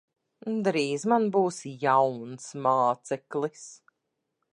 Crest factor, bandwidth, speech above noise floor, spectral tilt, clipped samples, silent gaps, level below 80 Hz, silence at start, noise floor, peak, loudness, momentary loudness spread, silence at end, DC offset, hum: 18 dB; 11 kHz; 55 dB; -5.5 dB/octave; under 0.1%; none; -82 dBFS; 0.45 s; -81 dBFS; -10 dBFS; -27 LUFS; 15 LU; 0.8 s; under 0.1%; none